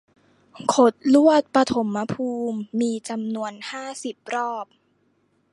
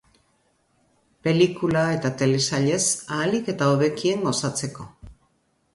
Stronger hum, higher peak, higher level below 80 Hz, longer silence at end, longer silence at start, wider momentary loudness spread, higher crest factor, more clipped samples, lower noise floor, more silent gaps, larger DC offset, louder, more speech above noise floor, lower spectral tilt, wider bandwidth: neither; about the same, -4 dBFS vs -6 dBFS; second, -64 dBFS vs -58 dBFS; first, 0.9 s vs 0.6 s; second, 0.55 s vs 1.25 s; first, 15 LU vs 9 LU; about the same, 20 dB vs 18 dB; neither; about the same, -66 dBFS vs -67 dBFS; neither; neither; about the same, -22 LUFS vs -22 LUFS; about the same, 44 dB vs 45 dB; about the same, -5 dB/octave vs -4.5 dB/octave; about the same, 11.5 kHz vs 11.5 kHz